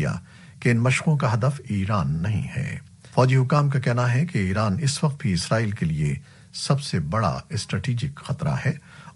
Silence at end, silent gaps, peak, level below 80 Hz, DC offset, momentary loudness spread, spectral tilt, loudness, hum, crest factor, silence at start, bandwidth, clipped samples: 0.05 s; none; -6 dBFS; -48 dBFS; under 0.1%; 10 LU; -6 dB/octave; -24 LUFS; none; 18 dB; 0 s; 11.5 kHz; under 0.1%